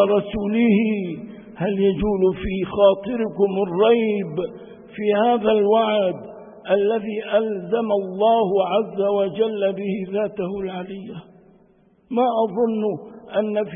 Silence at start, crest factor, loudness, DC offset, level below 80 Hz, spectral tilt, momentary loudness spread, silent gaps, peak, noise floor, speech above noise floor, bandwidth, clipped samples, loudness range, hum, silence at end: 0 s; 16 dB; -21 LUFS; under 0.1%; -48 dBFS; -11.5 dB/octave; 14 LU; none; -4 dBFS; -56 dBFS; 36 dB; 3.7 kHz; under 0.1%; 5 LU; none; 0 s